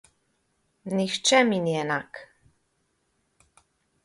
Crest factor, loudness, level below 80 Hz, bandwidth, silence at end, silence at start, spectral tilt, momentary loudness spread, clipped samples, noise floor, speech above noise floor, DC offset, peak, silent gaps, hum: 24 dB; -24 LUFS; -70 dBFS; 11.5 kHz; 1.8 s; 0.85 s; -3.5 dB/octave; 23 LU; under 0.1%; -73 dBFS; 49 dB; under 0.1%; -6 dBFS; none; none